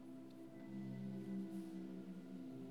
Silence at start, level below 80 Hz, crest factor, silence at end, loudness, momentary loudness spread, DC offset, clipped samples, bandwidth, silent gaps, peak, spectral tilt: 0 s; -88 dBFS; 12 dB; 0 s; -51 LUFS; 8 LU; under 0.1%; under 0.1%; 15 kHz; none; -38 dBFS; -8 dB/octave